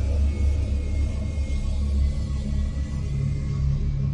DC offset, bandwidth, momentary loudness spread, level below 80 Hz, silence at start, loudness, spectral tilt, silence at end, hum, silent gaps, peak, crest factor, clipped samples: under 0.1%; 8.8 kHz; 4 LU; -26 dBFS; 0 s; -26 LUFS; -7.5 dB/octave; 0 s; none; none; -12 dBFS; 10 dB; under 0.1%